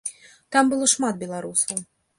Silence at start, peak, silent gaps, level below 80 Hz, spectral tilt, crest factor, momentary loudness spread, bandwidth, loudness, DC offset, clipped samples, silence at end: 0.05 s; -4 dBFS; none; -66 dBFS; -2 dB/octave; 20 dB; 12 LU; 11.5 kHz; -22 LUFS; under 0.1%; under 0.1%; 0.35 s